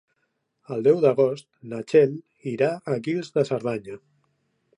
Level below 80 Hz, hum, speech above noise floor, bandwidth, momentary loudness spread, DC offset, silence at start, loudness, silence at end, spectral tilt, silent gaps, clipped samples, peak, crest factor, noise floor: -72 dBFS; none; 52 dB; 10.5 kHz; 17 LU; under 0.1%; 0.7 s; -23 LUFS; 0.8 s; -7.5 dB/octave; none; under 0.1%; -6 dBFS; 18 dB; -75 dBFS